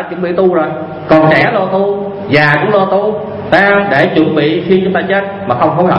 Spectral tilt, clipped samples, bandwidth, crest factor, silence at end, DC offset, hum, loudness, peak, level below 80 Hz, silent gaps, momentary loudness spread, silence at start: -8 dB/octave; 0.3%; 7.2 kHz; 10 dB; 0 s; under 0.1%; none; -11 LUFS; 0 dBFS; -46 dBFS; none; 8 LU; 0 s